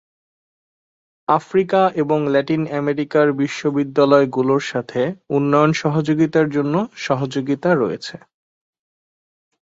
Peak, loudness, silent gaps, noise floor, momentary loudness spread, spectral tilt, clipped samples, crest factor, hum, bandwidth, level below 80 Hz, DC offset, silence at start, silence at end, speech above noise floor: -2 dBFS; -18 LUFS; none; under -90 dBFS; 7 LU; -7 dB/octave; under 0.1%; 18 dB; none; 7.8 kHz; -62 dBFS; under 0.1%; 1.3 s; 1.45 s; over 72 dB